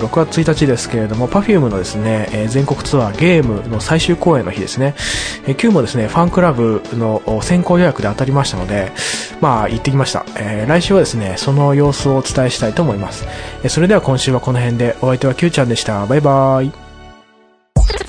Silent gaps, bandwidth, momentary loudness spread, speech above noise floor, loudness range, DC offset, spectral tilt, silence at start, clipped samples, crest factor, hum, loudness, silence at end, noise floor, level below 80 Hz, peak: none; 10.5 kHz; 7 LU; 36 dB; 1 LU; under 0.1%; -6 dB/octave; 0 s; under 0.1%; 14 dB; none; -15 LUFS; 0 s; -50 dBFS; -28 dBFS; 0 dBFS